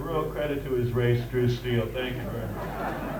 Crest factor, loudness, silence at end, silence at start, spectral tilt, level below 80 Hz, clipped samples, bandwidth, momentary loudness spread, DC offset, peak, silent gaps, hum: 16 dB; -28 LUFS; 0 s; 0 s; -7.5 dB/octave; -42 dBFS; under 0.1%; 19 kHz; 7 LU; under 0.1%; -12 dBFS; none; none